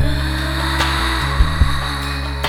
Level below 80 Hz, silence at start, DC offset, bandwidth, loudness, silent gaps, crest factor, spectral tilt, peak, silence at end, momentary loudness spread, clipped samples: -20 dBFS; 0 s; under 0.1%; 15 kHz; -18 LUFS; none; 16 dB; -4.5 dB/octave; -2 dBFS; 0 s; 5 LU; under 0.1%